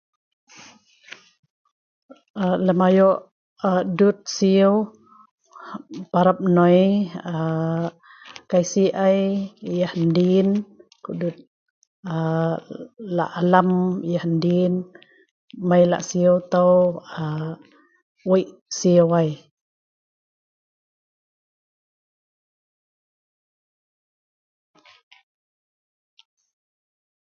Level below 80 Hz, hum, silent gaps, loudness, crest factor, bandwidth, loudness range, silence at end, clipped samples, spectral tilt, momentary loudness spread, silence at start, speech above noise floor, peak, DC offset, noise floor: -66 dBFS; none; 3.32-3.56 s, 5.31-5.38 s, 11.47-12.03 s, 15.31-15.48 s, 18.02-18.15 s, 18.61-18.66 s; -20 LUFS; 22 dB; 7.2 kHz; 4 LU; 8 s; under 0.1%; -7 dB/octave; 17 LU; 2.35 s; 30 dB; 0 dBFS; under 0.1%; -50 dBFS